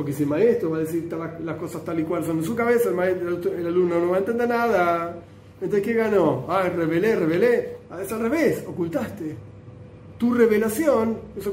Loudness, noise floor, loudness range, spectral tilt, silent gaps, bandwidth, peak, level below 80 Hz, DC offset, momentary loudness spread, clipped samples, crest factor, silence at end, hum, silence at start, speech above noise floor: -23 LUFS; -42 dBFS; 2 LU; -6.5 dB/octave; none; 16 kHz; -6 dBFS; -56 dBFS; under 0.1%; 11 LU; under 0.1%; 18 dB; 0 s; none; 0 s; 20 dB